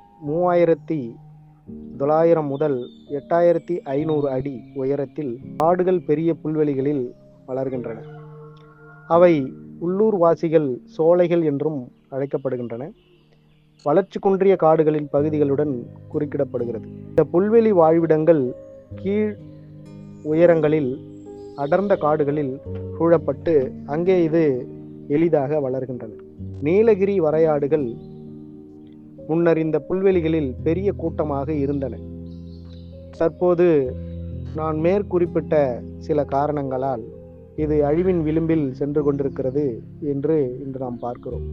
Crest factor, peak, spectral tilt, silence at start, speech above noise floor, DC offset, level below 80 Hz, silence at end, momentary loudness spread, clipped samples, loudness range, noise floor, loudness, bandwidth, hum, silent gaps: 20 dB; -2 dBFS; -10 dB/octave; 0.2 s; 35 dB; under 0.1%; -48 dBFS; 0 s; 19 LU; under 0.1%; 4 LU; -55 dBFS; -21 LUFS; 6.2 kHz; none; none